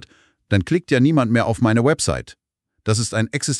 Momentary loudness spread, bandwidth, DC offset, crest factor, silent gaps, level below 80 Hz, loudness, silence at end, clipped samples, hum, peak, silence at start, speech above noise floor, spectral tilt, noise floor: 6 LU; 12.5 kHz; under 0.1%; 16 dB; none; -46 dBFS; -19 LUFS; 0 s; under 0.1%; none; -2 dBFS; 0.5 s; 32 dB; -5.5 dB/octave; -50 dBFS